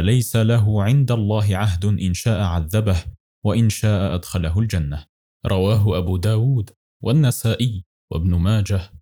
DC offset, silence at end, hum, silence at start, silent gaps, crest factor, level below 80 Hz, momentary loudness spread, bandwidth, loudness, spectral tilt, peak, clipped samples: 0.1%; 0.05 s; none; 0 s; 3.20-3.42 s, 5.09-5.40 s, 6.76-7.00 s, 7.86-8.08 s; 12 dB; -40 dBFS; 8 LU; 19 kHz; -20 LUFS; -6.5 dB/octave; -6 dBFS; under 0.1%